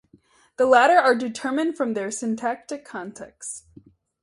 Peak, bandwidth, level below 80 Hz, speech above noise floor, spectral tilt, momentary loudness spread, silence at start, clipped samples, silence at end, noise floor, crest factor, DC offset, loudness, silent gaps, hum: -2 dBFS; 11.5 kHz; -68 dBFS; 36 dB; -3.5 dB/octave; 19 LU; 0.6 s; under 0.1%; 0.65 s; -57 dBFS; 20 dB; under 0.1%; -21 LUFS; none; none